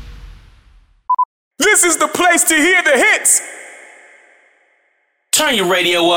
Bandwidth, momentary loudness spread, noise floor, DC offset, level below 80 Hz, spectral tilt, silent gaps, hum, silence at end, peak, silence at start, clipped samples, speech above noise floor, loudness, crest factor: 17 kHz; 9 LU; -63 dBFS; under 0.1%; -46 dBFS; -0.5 dB/octave; 1.25-1.51 s; none; 0 s; -2 dBFS; 0 s; under 0.1%; 50 dB; -12 LUFS; 14 dB